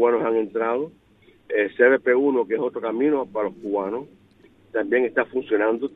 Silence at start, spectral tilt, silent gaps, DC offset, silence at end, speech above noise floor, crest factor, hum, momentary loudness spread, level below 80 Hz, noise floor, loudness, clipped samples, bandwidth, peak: 0 s; -8.5 dB/octave; none; under 0.1%; 0.05 s; 32 dB; 18 dB; none; 10 LU; -68 dBFS; -54 dBFS; -22 LUFS; under 0.1%; 3.9 kHz; -4 dBFS